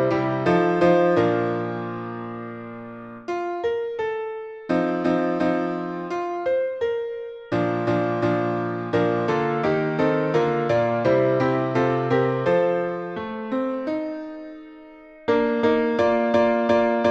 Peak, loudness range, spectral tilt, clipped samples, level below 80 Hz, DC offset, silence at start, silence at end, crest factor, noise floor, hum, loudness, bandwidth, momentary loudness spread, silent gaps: -8 dBFS; 5 LU; -8 dB/octave; under 0.1%; -58 dBFS; under 0.1%; 0 s; 0 s; 16 dB; -44 dBFS; none; -23 LUFS; 8 kHz; 13 LU; none